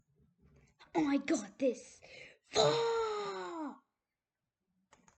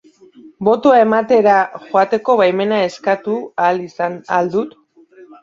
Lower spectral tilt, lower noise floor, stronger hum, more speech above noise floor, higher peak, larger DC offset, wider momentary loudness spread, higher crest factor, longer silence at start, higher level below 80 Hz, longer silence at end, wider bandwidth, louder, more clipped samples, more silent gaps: second, -4 dB/octave vs -6 dB/octave; first, under -90 dBFS vs -45 dBFS; neither; first, over 57 dB vs 30 dB; second, -16 dBFS vs -2 dBFS; neither; first, 22 LU vs 10 LU; first, 22 dB vs 14 dB; first, 0.8 s vs 0.45 s; second, -74 dBFS vs -62 dBFS; first, 1.4 s vs 0.2 s; first, 9 kHz vs 7.6 kHz; second, -35 LUFS vs -15 LUFS; neither; neither